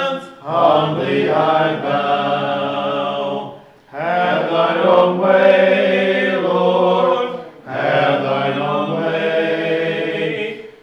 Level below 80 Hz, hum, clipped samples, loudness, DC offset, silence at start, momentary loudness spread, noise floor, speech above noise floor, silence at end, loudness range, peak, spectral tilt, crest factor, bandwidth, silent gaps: -66 dBFS; none; under 0.1%; -16 LUFS; under 0.1%; 0 s; 11 LU; -37 dBFS; 21 dB; 0.1 s; 4 LU; -2 dBFS; -7 dB/octave; 16 dB; 7.2 kHz; none